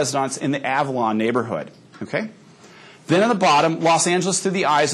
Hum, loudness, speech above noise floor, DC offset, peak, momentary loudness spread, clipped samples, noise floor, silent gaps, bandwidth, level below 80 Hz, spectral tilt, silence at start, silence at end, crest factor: none; -20 LUFS; 26 dB; under 0.1%; -4 dBFS; 12 LU; under 0.1%; -45 dBFS; none; 12.5 kHz; -74 dBFS; -4 dB/octave; 0 s; 0 s; 16 dB